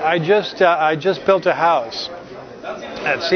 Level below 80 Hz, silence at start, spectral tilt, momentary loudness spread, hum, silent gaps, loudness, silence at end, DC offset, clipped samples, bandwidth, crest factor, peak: -58 dBFS; 0 s; -5 dB/octave; 16 LU; none; none; -17 LUFS; 0 s; under 0.1%; under 0.1%; 6.6 kHz; 16 dB; -2 dBFS